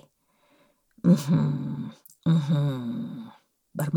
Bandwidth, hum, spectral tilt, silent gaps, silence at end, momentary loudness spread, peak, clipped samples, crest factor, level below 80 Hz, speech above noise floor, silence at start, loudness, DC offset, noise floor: 18 kHz; none; -8 dB/octave; none; 0 s; 18 LU; -8 dBFS; under 0.1%; 18 dB; -66 dBFS; 42 dB; 1.05 s; -26 LUFS; under 0.1%; -66 dBFS